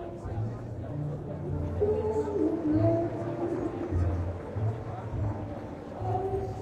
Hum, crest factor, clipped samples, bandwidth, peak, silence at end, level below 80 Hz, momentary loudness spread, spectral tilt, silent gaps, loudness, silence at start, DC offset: none; 18 dB; under 0.1%; 8.8 kHz; -14 dBFS; 0 s; -46 dBFS; 10 LU; -10 dB/octave; none; -32 LUFS; 0 s; under 0.1%